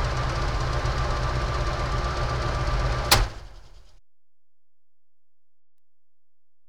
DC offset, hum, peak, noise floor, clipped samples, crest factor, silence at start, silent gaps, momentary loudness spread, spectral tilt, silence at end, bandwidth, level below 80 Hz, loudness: 0.5%; none; -4 dBFS; under -90 dBFS; under 0.1%; 24 dB; 0 s; none; 7 LU; -4 dB/octave; 2.9 s; over 20 kHz; -32 dBFS; -26 LUFS